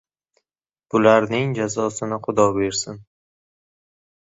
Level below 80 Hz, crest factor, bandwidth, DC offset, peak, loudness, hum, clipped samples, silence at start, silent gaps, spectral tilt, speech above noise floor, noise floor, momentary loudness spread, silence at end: -56 dBFS; 20 dB; 8 kHz; under 0.1%; -2 dBFS; -20 LUFS; none; under 0.1%; 0.95 s; none; -5 dB/octave; 67 dB; -87 dBFS; 11 LU; 1.2 s